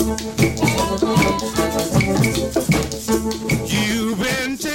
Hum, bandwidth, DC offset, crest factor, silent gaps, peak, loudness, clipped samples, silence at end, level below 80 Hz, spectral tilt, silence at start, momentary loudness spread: none; 17 kHz; under 0.1%; 18 dB; none; -2 dBFS; -19 LUFS; under 0.1%; 0 s; -34 dBFS; -4.5 dB/octave; 0 s; 4 LU